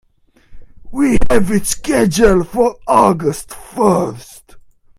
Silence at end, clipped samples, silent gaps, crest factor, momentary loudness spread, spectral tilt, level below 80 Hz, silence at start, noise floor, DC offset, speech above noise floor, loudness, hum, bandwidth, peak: 0.4 s; under 0.1%; none; 14 dB; 14 LU; -5.5 dB/octave; -30 dBFS; 0.5 s; -48 dBFS; under 0.1%; 35 dB; -14 LUFS; none; 16 kHz; 0 dBFS